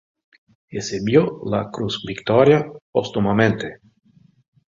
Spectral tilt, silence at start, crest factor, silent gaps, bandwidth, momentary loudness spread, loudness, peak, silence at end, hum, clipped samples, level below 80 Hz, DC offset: -6 dB/octave; 0.7 s; 18 dB; 2.81-2.93 s; 7.6 kHz; 12 LU; -20 LUFS; -2 dBFS; 1.05 s; none; under 0.1%; -52 dBFS; under 0.1%